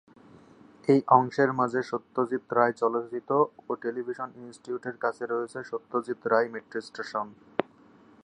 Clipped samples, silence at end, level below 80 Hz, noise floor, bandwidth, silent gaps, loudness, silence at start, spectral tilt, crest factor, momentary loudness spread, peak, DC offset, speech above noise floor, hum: under 0.1%; 0.6 s; -76 dBFS; -56 dBFS; 10.5 kHz; none; -28 LUFS; 0.85 s; -7 dB/octave; 24 dB; 13 LU; -4 dBFS; under 0.1%; 29 dB; none